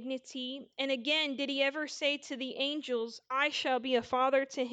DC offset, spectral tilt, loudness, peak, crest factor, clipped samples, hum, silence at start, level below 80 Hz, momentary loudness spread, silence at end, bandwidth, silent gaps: under 0.1%; -2 dB/octave; -32 LUFS; -16 dBFS; 18 dB; under 0.1%; none; 0 s; -78 dBFS; 9 LU; 0 s; 9 kHz; none